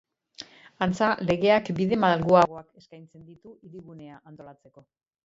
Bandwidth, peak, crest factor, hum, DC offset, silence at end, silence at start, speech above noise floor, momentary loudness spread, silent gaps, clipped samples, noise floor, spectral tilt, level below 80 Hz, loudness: 7.8 kHz; -6 dBFS; 20 dB; none; under 0.1%; 0.7 s; 0.8 s; 22 dB; 26 LU; none; under 0.1%; -48 dBFS; -6.5 dB/octave; -60 dBFS; -23 LUFS